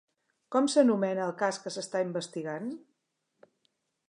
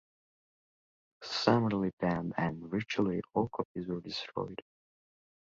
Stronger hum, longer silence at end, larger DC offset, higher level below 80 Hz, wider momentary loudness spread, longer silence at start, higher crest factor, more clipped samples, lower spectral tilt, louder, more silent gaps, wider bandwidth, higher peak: neither; first, 1.3 s vs 0.8 s; neither; second, -86 dBFS vs -64 dBFS; about the same, 13 LU vs 11 LU; second, 0.5 s vs 1.2 s; about the same, 20 dB vs 24 dB; neither; second, -5 dB/octave vs -6.5 dB/octave; first, -30 LUFS vs -33 LUFS; second, none vs 1.93-1.97 s, 3.65-3.75 s; first, 11 kHz vs 7.6 kHz; about the same, -12 dBFS vs -12 dBFS